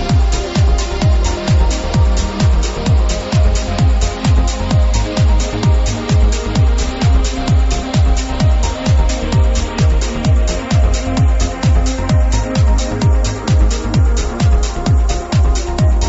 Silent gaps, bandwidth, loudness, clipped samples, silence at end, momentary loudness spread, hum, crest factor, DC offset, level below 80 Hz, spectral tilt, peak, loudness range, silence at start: none; 8 kHz; -15 LUFS; under 0.1%; 0 s; 2 LU; none; 12 dB; under 0.1%; -14 dBFS; -5.5 dB/octave; -2 dBFS; 0 LU; 0 s